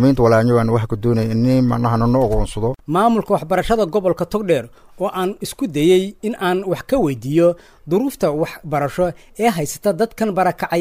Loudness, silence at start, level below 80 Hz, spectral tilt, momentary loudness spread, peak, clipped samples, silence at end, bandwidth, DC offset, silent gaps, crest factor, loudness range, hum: -18 LUFS; 0 s; -34 dBFS; -6.5 dB/octave; 7 LU; -2 dBFS; under 0.1%; 0 s; 16 kHz; under 0.1%; none; 14 dB; 2 LU; none